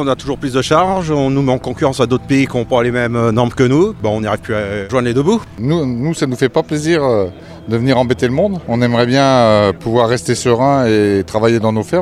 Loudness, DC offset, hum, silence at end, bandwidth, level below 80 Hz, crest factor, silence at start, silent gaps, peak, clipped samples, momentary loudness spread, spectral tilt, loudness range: -14 LUFS; under 0.1%; none; 0 s; 14 kHz; -40 dBFS; 14 dB; 0 s; none; 0 dBFS; under 0.1%; 6 LU; -6 dB/octave; 3 LU